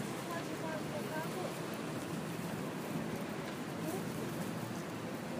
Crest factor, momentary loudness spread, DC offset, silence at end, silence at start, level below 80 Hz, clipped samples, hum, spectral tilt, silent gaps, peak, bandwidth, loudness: 14 dB; 2 LU; under 0.1%; 0 s; 0 s; -70 dBFS; under 0.1%; none; -5 dB/octave; none; -26 dBFS; 15.5 kHz; -40 LUFS